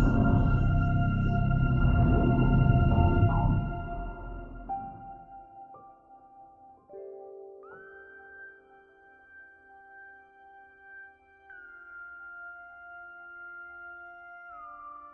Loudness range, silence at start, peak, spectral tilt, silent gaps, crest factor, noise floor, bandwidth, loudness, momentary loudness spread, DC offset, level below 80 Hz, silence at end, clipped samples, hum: 25 LU; 0 s; -10 dBFS; -10.5 dB/octave; none; 18 dB; -57 dBFS; 3.3 kHz; -26 LUFS; 25 LU; under 0.1%; -36 dBFS; 0.05 s; under 0.1%; none